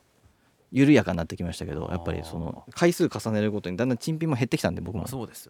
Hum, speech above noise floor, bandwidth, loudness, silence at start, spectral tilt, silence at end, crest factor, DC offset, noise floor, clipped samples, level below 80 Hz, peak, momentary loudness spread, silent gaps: none; 36 dB; 17.5 kHz; -26 LUFS; 0.7 s; -6.5 dB/octave; 0.05 s; 20 dB; under 0.1%; -62 dBFS; under 0.1%; -50 dBFS; -6 dBFS; 13 LU; none